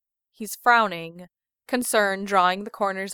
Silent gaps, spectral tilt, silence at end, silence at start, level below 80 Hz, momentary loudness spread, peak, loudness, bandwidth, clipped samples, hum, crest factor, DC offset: none; -3 dB/octave; 0 s; 0.4 s; -68 dBFS; 16 LU; -4 dBFS; -22 LUFS; over 20 kHz; under 0.1%; none; 20 dB; under 0.1%